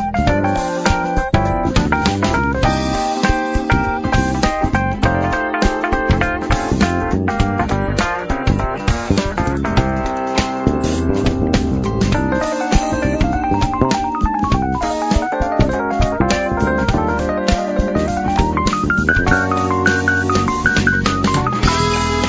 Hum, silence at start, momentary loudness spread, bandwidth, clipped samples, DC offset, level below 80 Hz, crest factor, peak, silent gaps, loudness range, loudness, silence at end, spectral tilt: none; 0 s; 3 LU; 8 kHz; under 0.1%; under 0.1%; -24 dBFS; 16 dB; 0 dBFS; none; 2 LU; -17 LUFS; 0 s; -5.5 dB/octave